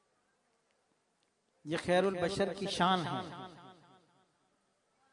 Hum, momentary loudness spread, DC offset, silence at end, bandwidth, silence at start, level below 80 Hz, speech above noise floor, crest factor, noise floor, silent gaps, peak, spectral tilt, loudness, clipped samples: none; 18 LU; under 0.1%; 1.4 s; 11 kHz; 1.65 s; -70 dBFS; 45 dB; 22 dB; -77 dBFS; none; -16 dBFS; -5 dB/octave; -33 LUFS; under 0.1%